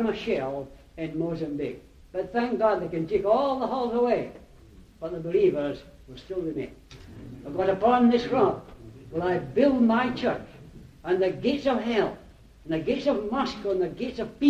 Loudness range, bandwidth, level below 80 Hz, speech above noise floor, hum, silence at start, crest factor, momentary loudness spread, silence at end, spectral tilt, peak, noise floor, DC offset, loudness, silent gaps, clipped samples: 5 LU; 8.2 kHz; -52 dBFS; 25 dB; none; 0 s; 18 dB; 18 LU; 0 s; -7 dB/octave; -8 dBFS; -51 dBFS; under 0.1%; -26 LUFS; none; under 0.1%